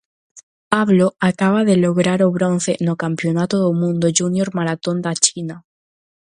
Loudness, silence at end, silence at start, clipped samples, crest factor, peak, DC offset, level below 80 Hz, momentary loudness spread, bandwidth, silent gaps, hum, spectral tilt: -17 LUFS; 0.8 s; 0.35 s; under 0.1%; 18 dB; 0 dBFS; under 0.1%; -60 dBFS; 6 LU; 11 kHz; 0.43-0.71 s; none; -5 dB/octave